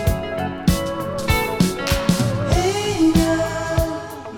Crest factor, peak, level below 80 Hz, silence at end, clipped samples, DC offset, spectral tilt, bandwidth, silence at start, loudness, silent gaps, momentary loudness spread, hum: 16 dB; -4 dBFS; -30 dBFS; 0 s; under 0.1%; under 0.1%; -5.5 dB/octave; 19.5 kHz; 0 s; -20 LUFS; none; 8 LU; none